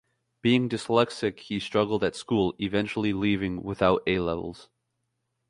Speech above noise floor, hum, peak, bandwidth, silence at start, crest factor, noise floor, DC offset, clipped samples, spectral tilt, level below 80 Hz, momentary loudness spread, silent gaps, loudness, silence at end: 53 dB; none; -6 dBFS; 11.5 kHz; 0.45 s; 20 dB; -79 dBFS; under 0.1%; under 0.1%; -6 dB/octave; -52 dBFS; 7 LU; none; -26 LUFS; 0.85 s